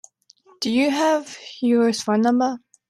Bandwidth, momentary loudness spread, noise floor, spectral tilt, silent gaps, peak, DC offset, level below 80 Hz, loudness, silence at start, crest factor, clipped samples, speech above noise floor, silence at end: 13.5 kHz; 7 LU; -55 dBFS; -4.5 dB/octave; none; -8 dBFS; under 0.1%; -70 dBFS; -21 LUFS; 0.6 s; 14 dB; under 0.1%; 35 dB; 0.35 s